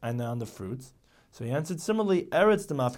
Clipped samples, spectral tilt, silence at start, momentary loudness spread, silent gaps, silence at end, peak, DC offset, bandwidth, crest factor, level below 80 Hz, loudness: under 0.1%; -6 dB/octave; 0 s; 16 LU; none; 0 s; -10 dBFS; under 0.1%; 17 kHz; 18 dB; -60 dBFS; -28 LUFS